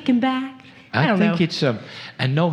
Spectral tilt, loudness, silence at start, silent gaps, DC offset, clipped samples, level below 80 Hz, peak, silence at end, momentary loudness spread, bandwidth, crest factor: -7 dB/octave; -21 LUFS; 0 s; none; under 0.1%; under 0.1%; -68 dBFS; -2 dBFS; 0 s; 13 LU; 10 kHz; 18 dB